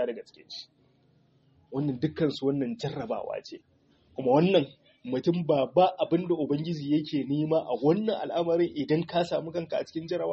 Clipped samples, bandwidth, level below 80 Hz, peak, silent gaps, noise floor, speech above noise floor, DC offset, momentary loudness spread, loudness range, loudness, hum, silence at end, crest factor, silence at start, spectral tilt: under 0.1%; 7.2 kHz; -68 dBFS; -8 dBFS; none; -64 dBFS; 37 dB; under 0.1%; 15 LU; 6 LU; -28 LUFS; none; 0 s; 20 dB; 0 s; -6 dB/octave